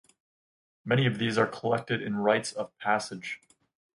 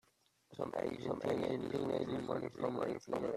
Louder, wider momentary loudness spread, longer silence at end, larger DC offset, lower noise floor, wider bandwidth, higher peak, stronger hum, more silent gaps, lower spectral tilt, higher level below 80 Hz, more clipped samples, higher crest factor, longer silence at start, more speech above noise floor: first, -29 LUFS vs -40 LUFS; first, 12 LU vs 4 LU; first, 0.6 s vs 0 s; neither; first, under -90 dBFS vs -74 dBFS; second, 11.5 kHz vs 13.5 kHz; first, -10 dBFS vs -22 dBFS; neither; neither; second, -5.5 dB/octave vs -7 dB/octave; about the same, -68 dBFS vs -70 dBFS; neither; about the same, 20 dB vs 18 dB; first, 0.85 s vs 0.5 s; first, over 62 dB vs 36 dB